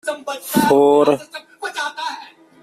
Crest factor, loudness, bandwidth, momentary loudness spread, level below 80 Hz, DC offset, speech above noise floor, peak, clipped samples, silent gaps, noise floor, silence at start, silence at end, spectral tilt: 16 dB; -17 LUFS; 15.5 kHz; 17 LU; -60 dBFS; under 0.1%; 22 dB; -2 dBFS; under 0.1%; none; -38 dBFS; 0.05 s; 0.35 s; -4.5 dB/octave